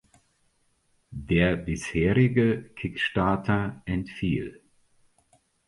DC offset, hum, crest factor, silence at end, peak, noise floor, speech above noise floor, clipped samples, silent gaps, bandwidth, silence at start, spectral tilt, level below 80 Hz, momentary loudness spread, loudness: under 0.1%; none; 20 dB; 1.15 s; -8 dBFS; -69 dBFS; 44 dB; under 0.1%; none; 11.5 kHz; 1.1 s; -7 dB/octave; -44 dBFS; 11 LU; -26 LUFS